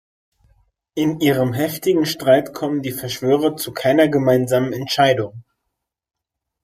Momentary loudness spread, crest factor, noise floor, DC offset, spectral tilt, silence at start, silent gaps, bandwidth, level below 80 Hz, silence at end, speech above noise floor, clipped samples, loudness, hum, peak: 8 LU; 18 dB; -79 dBFS; under 0.1%; -5.5 dB/octave; 0.95 s; none; 15.5 kHz; -58 dBFS; 1.25 s; 61 dB; under 0.1%; -18 LUFS; none; -2 dBFS